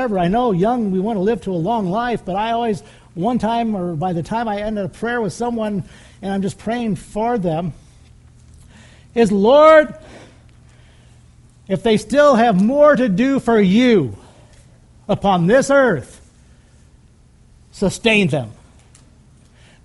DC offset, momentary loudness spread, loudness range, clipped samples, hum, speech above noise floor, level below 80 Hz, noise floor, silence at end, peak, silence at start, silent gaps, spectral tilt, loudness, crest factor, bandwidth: under 0.1%; 13 LU; 8 LU; under 0.1%; none; 33 dB; -46 dBFS; -49 dBFS; 1.3 s; 0 dBFS; 0 s; none; -6.5 dB/octave; -17 LUFS; 18 dB; 11.5 kHz